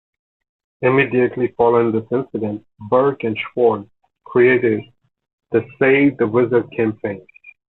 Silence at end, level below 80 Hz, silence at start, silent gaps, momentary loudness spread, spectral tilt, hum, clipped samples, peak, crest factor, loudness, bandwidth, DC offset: 0.25 s; -58 dBFS; 0.8 s; 5.33-5.38 s; 11 LU; -10.5 dB/octave; none; under 0.1%; -2 dBFS; 16 dB; -18 LUFS; 4.1 kHz; under 0.1%